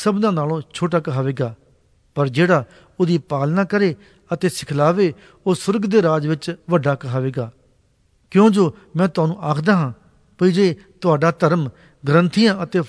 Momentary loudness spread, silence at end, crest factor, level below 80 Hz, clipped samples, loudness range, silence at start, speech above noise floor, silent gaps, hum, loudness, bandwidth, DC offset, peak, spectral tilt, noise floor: 10 LU; 0 s; 16 dB; -58 dBFS; under 0.1%; 2 LU; 0 s; 42 dB; none; none; -19 LUFS; 11 kHz; under 0.1%; -2 dBFS; -7 dB/octave; -60 dBFS